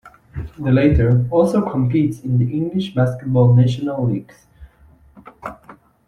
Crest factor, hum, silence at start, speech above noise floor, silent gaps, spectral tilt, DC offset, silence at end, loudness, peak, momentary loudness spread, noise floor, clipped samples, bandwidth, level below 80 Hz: 16 dB; none; 0.05 s; 33 dB; none; -9 dB/octave; under 0.1%; 0.35 s; -17 LUFS; -2 dBFS; 19 LU; -50 dBFS; under 0.1%; 10.5 kHz; -36 dBFS